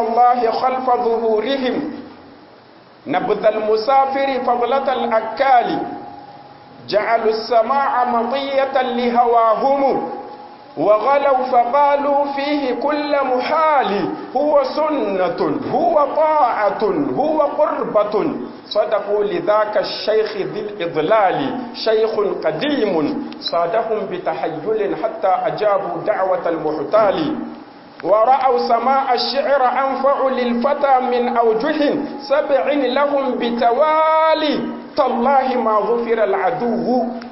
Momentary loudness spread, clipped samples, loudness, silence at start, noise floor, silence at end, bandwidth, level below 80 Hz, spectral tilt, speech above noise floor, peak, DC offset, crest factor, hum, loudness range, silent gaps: 8 LU; under 0.1%; -17 LUFS; 0 s; -45 dBFS; 0 s; 5.8 kHz; -58 dBFS; -9 dB/octave; 28 dB; -2 dBFS; under 0.1%; 14 dB; none; 3 LU; none